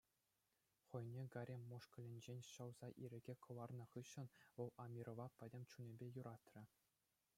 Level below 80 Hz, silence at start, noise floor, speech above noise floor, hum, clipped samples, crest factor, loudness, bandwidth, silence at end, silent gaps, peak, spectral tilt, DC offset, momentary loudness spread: -90 dBFS; 0.9 s; -89 dBFS; 33 dB; none; under 0.1%; 20 dB; -57 LUFS; 16 kHz; 0.7 s; none; -36 dBFS; -6.5 dB/octave; under 0.1%; 6 LU